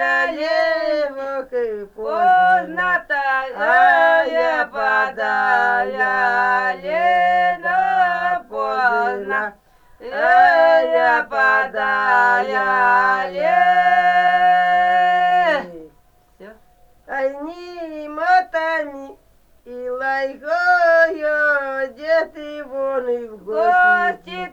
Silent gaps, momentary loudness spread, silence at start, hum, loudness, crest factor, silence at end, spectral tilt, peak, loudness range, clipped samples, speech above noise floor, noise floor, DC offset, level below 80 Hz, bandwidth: none; 12 LU; 0 s; none; -17 LUFS; 14 dB; 0.05 s; -4 dB/octave; -2 dBFS; 8 LU; under 0.1%; 37 dB; -54 dBFS; under 0.1%; -56 dBFS; 7.8 kHz